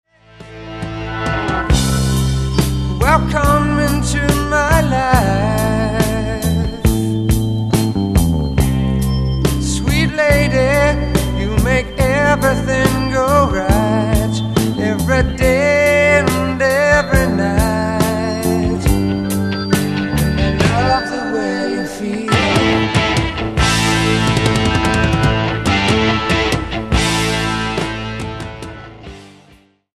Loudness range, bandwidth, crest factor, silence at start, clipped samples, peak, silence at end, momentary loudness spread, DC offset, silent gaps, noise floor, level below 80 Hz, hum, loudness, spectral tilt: 3 LU; 14 kHz; 14 dB; 0.4 s; under 0.1%; 0 dBFS; 0.7 s; 6 LU; under 0.1%; none; -49 dBFS; -24 dBFS; none; -15 LUFS; -5.5 dB/octave